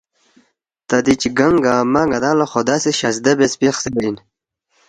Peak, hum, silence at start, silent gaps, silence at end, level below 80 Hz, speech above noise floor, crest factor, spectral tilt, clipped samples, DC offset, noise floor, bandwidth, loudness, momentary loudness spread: 0 dBFS; none; 0.9 s; none; 0.75 s; -50 dBFS; 50 dB; 18 dB; -4.5 dB/octave; under 0.1%; under 0.1%; -66 dBFS; 10 kHz; -16 LUFS; 6 LU